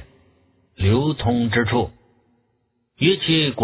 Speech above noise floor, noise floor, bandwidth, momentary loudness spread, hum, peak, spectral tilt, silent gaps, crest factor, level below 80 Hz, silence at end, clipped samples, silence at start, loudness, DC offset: 50 dB; -69 dBFS; 4 kHz; 6 LU; none; -4 dBFS; -10.5 dB/octave; none; 18 dB; -40 dBFS; 0 s; under 0.1%; 0 s; -20 LUFS; under 0.1%